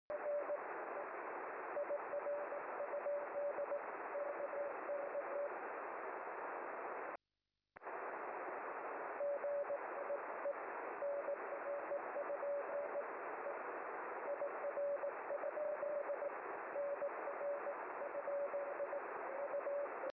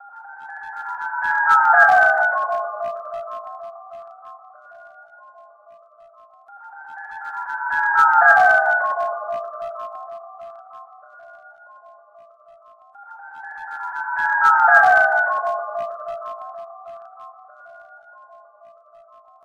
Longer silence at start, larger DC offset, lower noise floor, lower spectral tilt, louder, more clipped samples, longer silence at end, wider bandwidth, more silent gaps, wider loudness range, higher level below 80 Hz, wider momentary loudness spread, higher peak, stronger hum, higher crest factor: about the same, 0.1 s vs 0.05 s; neither; first, under -90 dBFS vs -49 dBFS; first, -3.5 dB/octave vs -2 dB/octave; second, -44 LUFS vs -17 LUFS; neither; second, 0.05 s vs 1.65 s; second, 3 kHz vs 11.5 kHz; neither; second, 3 LU vs 20 LU; second, under -90 dBFS vs -68 dBFS; second, 4 LU vs 27 LU; second, -32 dBFS vs -2 dBFS; neither; second, 10 dB vs 20 dB